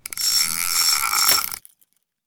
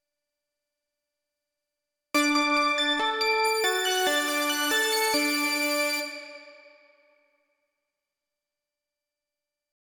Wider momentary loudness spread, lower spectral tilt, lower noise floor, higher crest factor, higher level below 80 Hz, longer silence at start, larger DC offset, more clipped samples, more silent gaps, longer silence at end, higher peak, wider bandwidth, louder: first, 8 LU vs 5 LU; second, 2.5 dB/octave vs 0.5 dB/octave; second, -65 dBFS vs -88 dBFS; about the same, 20 dB vs 16 dB; first, -58 dBFS vs -72 dBFS; second, 0.1 s vs 2.15 s; neither; neither; neither; second, 0.7 s vs 3.45 s; first, -2 dBFS vs -12 dBFS; about the same, over 20 kHz vs over 20 kHz; first, -17 LUFS vs -24 LUFS